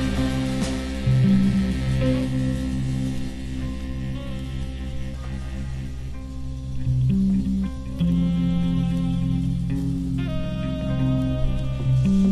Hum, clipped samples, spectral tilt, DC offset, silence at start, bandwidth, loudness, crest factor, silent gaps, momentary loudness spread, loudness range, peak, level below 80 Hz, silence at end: none; under 0.1%; -7.5 dB/octave; under 0.1%; 0 s; 12 kHz; -24 LUFS; 14 dB; none; 12 LU; 8 LU; -8 dBFS; -32 dBFS; 0 s